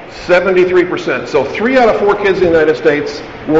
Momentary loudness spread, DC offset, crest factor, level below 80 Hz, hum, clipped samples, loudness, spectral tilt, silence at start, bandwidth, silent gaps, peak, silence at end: 7 LU; 0.6%; 10 dB; -42 dBFS; none; under 0.1%; -12 LUFS; -4 dB/octave; 0 s; 7.8 kHz; none; -2 dBFS; 0 s